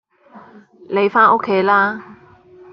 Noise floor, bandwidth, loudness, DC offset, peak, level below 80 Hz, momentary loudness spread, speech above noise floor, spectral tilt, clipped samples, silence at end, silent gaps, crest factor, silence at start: -45 dBFS; 5.8 kHz; -15 LUFS; under 0.1%; 0 dBFS; -64 dBFS; 10 LU; 30 dB; -3 dB/octave; under 0.1%; 0.6 s; none; 18 dB; 0.35 s